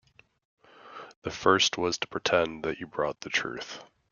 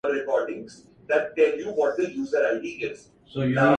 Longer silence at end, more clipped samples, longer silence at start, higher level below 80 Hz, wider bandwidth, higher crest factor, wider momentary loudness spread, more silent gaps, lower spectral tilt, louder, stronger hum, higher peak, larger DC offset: first, 0.3 s vs 0 s; neither; first, 0.85 s vs 0.05 s; about the same, -64 dBFS vs -62 dBFS; second, 7.4 kHz vs 9.2 kHz; first, 24 dB vs 18 dB; first, 21 LU vs 14 LU; first, 1.16-1.22 s vs none; second, -2.5 dB/octave vs -7 dB/octave; second, -28 LUFS vs -25 LUFS; neither; about the same, -6 dBFS vs -6 dBFS; neither